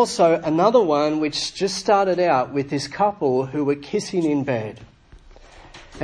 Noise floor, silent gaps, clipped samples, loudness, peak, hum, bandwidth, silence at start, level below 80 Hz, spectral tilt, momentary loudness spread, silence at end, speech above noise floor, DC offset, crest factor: -47 dBFS; none; under 0.1%; -20 LUFS; -2 dBFS; none; 10.5 kHz; 0 s; -54 dBFS; -5 dB/octave; 8 LU; 0 s; 27 dB; under 0.1%; 18 dB